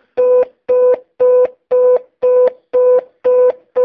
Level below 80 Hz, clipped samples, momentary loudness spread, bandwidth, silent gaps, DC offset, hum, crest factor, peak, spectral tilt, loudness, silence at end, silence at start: -64 dBFS; under 0.1%; 3 LU; 3.4 kHz; none; under 0.1%; none; 10 dB; -4 dBFS; -7.5 dB/octave; -13 LUFS; 0 s; 0.15 s